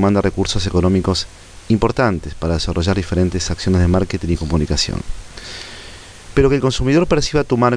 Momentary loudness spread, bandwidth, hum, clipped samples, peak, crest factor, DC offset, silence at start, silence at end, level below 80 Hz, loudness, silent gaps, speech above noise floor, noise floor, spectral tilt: 16 LU; 10.5 kHz; none; under 0.1%; -2 dBFS; 16 dB; under 0.1%; 0 s; 0 s; -28 dBFS; -17 LUFS; none; 20 dB; -36 dBFS; -5.5 dB/octave